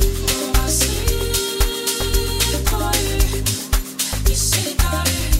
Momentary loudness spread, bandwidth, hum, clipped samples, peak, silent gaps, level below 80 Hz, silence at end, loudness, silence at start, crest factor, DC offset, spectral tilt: 3 LU; 16.5 kHz; none; under 0.1%; -2 dBFS; none; -22 dBFS; 0 s; -19 LUFS; 0 s; 16 dB; 0.2%; -3 dB/octave